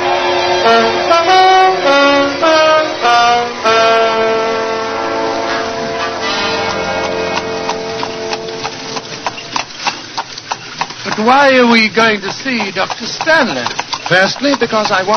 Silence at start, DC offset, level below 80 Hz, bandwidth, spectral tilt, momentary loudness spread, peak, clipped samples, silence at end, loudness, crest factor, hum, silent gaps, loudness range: 0 s; under 0.1%; -50 dBFS; 10 kHz; -3 dB/octave; 12 LU; 0 dBFS; under 0.1%; 0 s; -12 LUFS; 12 dB; none; none; 10 LU